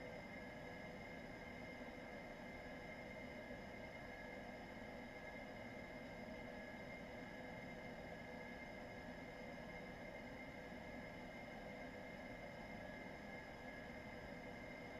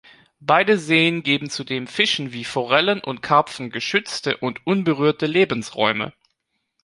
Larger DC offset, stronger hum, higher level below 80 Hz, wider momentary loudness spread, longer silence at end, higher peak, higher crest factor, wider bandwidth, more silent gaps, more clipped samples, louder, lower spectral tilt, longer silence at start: neither; neither; about the same, -66 dBFS vs -62 dBFS; second, 1 LU vs 9 LU; second, 0 s vs 0.75 s; second, -40 dBFS vs -2 dBFS; second, 14 dB vs 20 dB; first, 15 kHz vs 11.5 kHz; neither; neither; second, -53 LUFS vs -20 LUFS; about the same, -5.5 dB/octave vs -4.5 dB/octave; second, 0 s vs 0.4 s